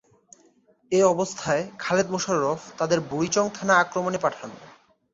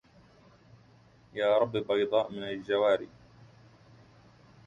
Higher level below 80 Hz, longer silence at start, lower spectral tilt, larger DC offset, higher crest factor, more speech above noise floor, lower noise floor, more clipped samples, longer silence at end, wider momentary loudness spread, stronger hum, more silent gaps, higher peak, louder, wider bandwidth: about the same, -64 dBFS vs -68 dBFS; second, 0.9 s vs 1.35 s; second, -4 dB/octave vs -6.5 dB/octave; neither; about the same, 20 dB vs 20 dB; first, 37 dB vs 31 dB; about the same, -61 dBFS vs -59 dBFS; neither; second, 0.45 s vs 1.25 s; second, 8 LU vs 11 LU; neither; neither; first, -6 dBFS vs -12 dBFS; first, -24 LUFS vs -29 LUFS; about the same, 8 kHz vs 7.6 kHz